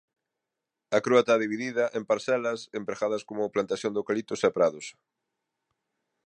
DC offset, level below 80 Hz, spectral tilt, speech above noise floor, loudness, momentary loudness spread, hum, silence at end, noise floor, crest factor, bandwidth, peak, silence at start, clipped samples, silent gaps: under 0.1%; -74 dBFS; -4.5 dB/octave; 59 dB; -27 LUFS; 9 LU; none; 1.35 s; -86 dBFS; 22 dB; 10 kHz; -8 dBFS; 0.9 s; under 0.1%; none